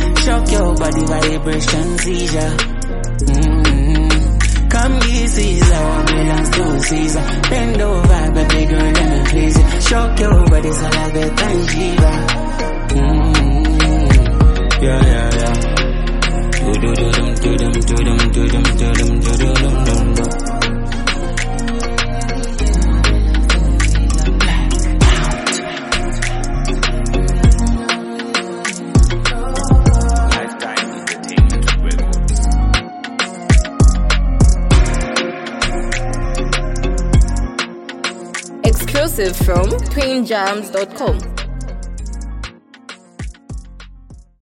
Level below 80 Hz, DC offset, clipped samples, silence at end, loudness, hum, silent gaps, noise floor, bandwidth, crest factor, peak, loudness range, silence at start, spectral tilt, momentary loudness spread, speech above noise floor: -16 dBFS; under 0.1%; under 0.1%; 0.3 s; -16 LUFS; none; none; -39 dBFS; 14 kHz; 14 dB; 0 dBFS; 4 LU; 0 s; -5 dB/octave; 8 LU; 26 dB